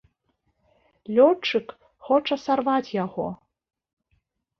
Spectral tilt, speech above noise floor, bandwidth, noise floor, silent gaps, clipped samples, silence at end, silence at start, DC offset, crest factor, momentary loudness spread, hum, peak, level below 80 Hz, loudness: -6 dB/octave; 50 dB; 6.6 kHz; -72 dBFS; none; under 0.1%; 1.25 s; 1.1 s; under 0.1%; 22 dB; 14 LU; none; -4 dBFS; -66 dBFS; -23 LUFS